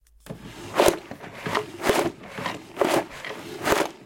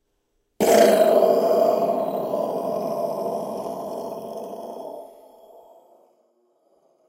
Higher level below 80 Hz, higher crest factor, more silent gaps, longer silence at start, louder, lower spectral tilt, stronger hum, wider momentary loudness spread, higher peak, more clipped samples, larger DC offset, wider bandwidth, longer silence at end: first, -52 dBFS vs -68 dBFS; first, 26 dB vs 20 dB; neither; second, 0.25 s vs 0.6 s; second, -26 LUFS vs -21 LUFS; about the same, -3.5 dB/octave vs -4.5 dB/octave; neither; about the same, 18 LU vs 19 LU; first, 0 dBFS vs -4 dBFS; neither; neither; about the same, 17 kHz vs 16 kHz; second, 0 s vs 2 s